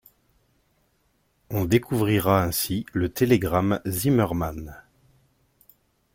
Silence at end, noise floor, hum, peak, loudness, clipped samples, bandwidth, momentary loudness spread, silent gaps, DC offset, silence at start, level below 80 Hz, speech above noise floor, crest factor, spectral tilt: 1.35 s; -68 dBFS; none; -4 dBFS; -23 LUFS; under 0.1%; 17 kHz; 10 LU; none; under 0.1%; 1.5 s; -48 dBFS; 45 dB; 20 dB; -6 dB/octave